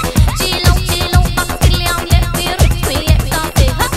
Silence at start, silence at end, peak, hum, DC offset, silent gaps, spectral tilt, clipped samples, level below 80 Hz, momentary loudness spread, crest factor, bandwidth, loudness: 0 s; 0 s; 0 dBFS; none; under 0.1%; none; -4.5 dB/octave; under 0.1%; -16 dBFS; 3 LU; 12 dB; 16.5 kHz; -13 LUFS